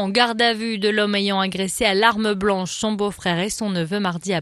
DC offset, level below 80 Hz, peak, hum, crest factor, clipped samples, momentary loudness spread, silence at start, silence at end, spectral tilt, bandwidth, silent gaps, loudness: under 0.1%; -52 dBFS; 0 dBFS; none; 20 dB; under 0.1%; 7 LU; 0 s; 0 s; -4 dB/octave; 13 kHz; none; -20 LUFS